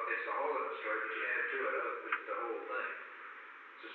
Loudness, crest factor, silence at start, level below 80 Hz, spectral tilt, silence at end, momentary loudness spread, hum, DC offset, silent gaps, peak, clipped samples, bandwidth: -37 LUFS; 18 dB; 0 s; under -90 dBFS; 3.5 dB/octave; 0 s; 14 LU; none; under 0.1%; none; -22 dBFS; under 0.1%; 6 kHz